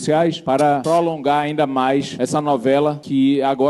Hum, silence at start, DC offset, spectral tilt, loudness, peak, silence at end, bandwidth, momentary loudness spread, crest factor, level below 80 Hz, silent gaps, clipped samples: none; 0 s; under 0.1%; -6 dB/octave; -18 LUFS; -4 dBFS; 0 s; 12 kHz; 3 LU; 12 dB; -60 dBFS; none; under 0.1%